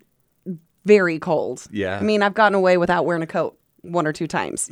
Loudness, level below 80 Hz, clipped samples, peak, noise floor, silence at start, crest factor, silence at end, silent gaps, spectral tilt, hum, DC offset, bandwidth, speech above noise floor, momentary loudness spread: -20 LUFS; -58 dBFS; under 0.1%; -2 dBFS; -39 dBFS; 0.45 s; 18 dB; 0.05 s; none; -5 dB/octave; none; under 0.1%; 13 kHz; 20 dB; 13 LU